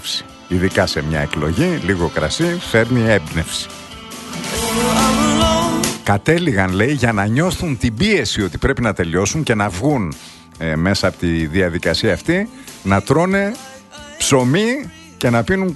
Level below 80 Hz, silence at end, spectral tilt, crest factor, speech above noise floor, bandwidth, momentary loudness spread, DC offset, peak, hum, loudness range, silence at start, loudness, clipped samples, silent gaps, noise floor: -36 dBFS; 0 s; -5 dB/octave; 16 dB; 20 dB; 12.5 kHz; 11 LU; under 0.1%; 0 dBFS; none; 2 LU; 0 s; -17 LUFS; under 0.1%; none; -37 dBFS